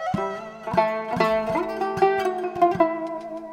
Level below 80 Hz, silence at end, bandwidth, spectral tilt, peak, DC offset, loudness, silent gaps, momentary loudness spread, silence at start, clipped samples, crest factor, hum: -54 dBFS; 0 s; 15 kHz; -6.5 dB/octave; -6 dBFS; under 0.1%; -24 LUFS; none; 10 LU; 0 s; under 0.1%; 18 dB; none